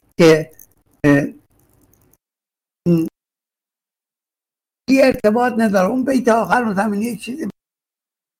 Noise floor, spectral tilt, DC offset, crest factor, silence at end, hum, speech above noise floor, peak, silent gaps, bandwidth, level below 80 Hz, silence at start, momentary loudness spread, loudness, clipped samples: under -90 dBFS; -6.5 dB/octave; under 0.1%; 16 dB; 0.9 s; none; over 74 dB; -2 dBFS; none; 16.5 kHz; -52 dBFS; 0.2 s; 15 LU; -16 LUFS; under 0.1%